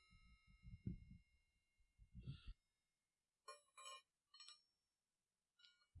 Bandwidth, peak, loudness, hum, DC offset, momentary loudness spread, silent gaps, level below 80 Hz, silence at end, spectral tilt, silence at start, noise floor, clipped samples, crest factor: 12 kHz; -36 dBFS; -61 LUFS; none; under 0.1%; 12 LU; none; -70 dBFS; 0 s; -4.5 dB/octave; 0 s; under -90 dBFS; under 0.1%; 26 dB